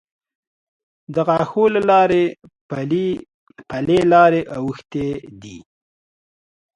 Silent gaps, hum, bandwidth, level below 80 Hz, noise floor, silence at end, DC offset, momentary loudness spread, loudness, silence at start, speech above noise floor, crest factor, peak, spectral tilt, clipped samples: 2.61-2.69 s, 3.34-3.47 s; none; 10.5 kHz; -54 dBFS; under -90 dBFS; 1.2 s; under 0.1%; 17 LU; -17 LUFS; 1.1 s; over 73 dB; 18 dB; 0 dBFS; -7.5 dB/octave; under 0.1%